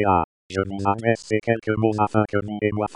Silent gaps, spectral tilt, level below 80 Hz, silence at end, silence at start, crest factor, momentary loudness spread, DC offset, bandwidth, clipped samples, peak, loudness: 0.24-0.50 s; -7.5 dB/octave; -50 dBFS; 0 s; 0 s; 18 dB; 5 LU; under 0.1%; 10.5 kHz; under 0.1%; -4 dBFS; -23 LUFS